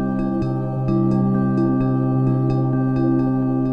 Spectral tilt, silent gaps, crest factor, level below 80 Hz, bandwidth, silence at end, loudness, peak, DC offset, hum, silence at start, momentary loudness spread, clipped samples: -11 dB/octave; none; 10 dB; -38 dBFS; 5.2 kHz; 0 s; -19 LUFS; -8 dBFS; under 0.1%; none; 0 s; 3 LU; under 0.1%